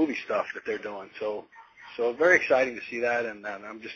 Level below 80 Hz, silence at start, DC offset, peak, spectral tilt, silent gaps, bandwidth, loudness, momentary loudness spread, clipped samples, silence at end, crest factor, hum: -68 dBFS; 0 s; under 0.1%; -6 dBFS; -4 dB/octave; none; 7 kHz; -27 LUFS; 17 LU; under 0.1%; 0 s; 22 dB; none